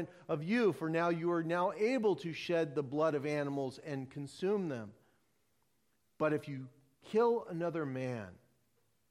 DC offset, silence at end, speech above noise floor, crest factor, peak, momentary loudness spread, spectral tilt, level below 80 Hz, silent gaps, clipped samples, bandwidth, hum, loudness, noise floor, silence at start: under 0.1%; 0.75 s; 44 dB; 16 dB; -20 dBFS; 13 LU; -7 dB/octave; -80 dBFS; none; under 0.1%; 13 kHz; none; -35 LUFS; -79 dBFS; 0 s